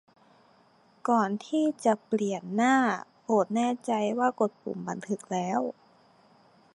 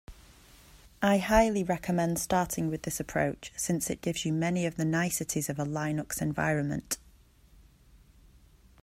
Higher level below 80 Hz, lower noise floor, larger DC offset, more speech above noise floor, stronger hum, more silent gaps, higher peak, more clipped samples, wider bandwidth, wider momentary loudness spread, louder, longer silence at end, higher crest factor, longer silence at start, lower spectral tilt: second, -80 dBFS vs -50 dBFS; about the same, -62 dBFS vs -59 dBFS; neither; first, 35 dB vs 30 dB; neither; neither; about the same, -10 dBFS vs -8 dBFS; neither; second, 11.5 kHz vs 16 kHz; first, 11 LU vs 8 LU; about the same, -28 LUFS vs -30 LUFS; second, 1.05 s vs 1.85 s; about the same, 18 dB vs 22 dB; first, 1.05 s vs 0.1 s; about the same, -5.5 dB/octave vs -5 dB/octave